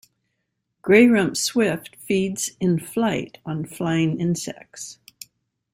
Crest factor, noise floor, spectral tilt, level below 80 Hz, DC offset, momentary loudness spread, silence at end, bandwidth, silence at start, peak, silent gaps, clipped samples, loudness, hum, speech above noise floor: 20 dB; -76 dBFS; -5 dB/octave; -60 dBFS; under 0.1%; 19 LU; 0.8 s; 16 kHz; 0.85 s; -2 dBFS; none; under 0.1%; -21 LUFS; none; 55 dB